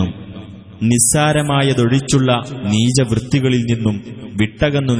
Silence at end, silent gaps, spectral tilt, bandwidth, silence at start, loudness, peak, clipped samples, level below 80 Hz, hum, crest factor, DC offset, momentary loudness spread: 0 s; none; -5 dB/octave; 11 kHz; 0 s; -15 LUFS; -2 dBFS; under 0.1%; -40 dBFS; none; 14 dB; under 0.1%; 13 LU